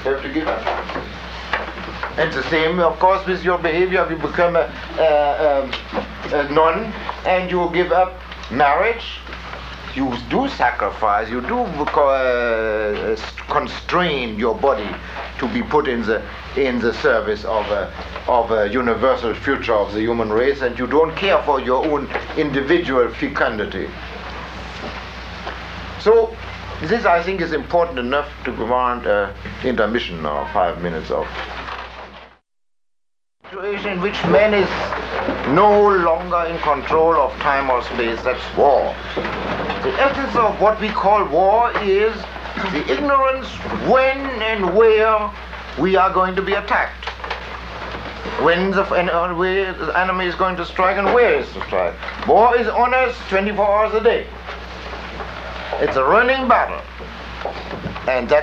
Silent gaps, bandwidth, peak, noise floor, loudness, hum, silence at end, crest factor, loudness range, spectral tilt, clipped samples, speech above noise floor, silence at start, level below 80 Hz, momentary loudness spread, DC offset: none; 7.8 kHz; -2 dBFS; -83 dBFS; -18 LUFS; none; 0 s; 16 dB; 4 LU; -6 dB/octave; under 0.1%; 65 dB; 0 s; -38 dBFS; 14 LU; under 0.1%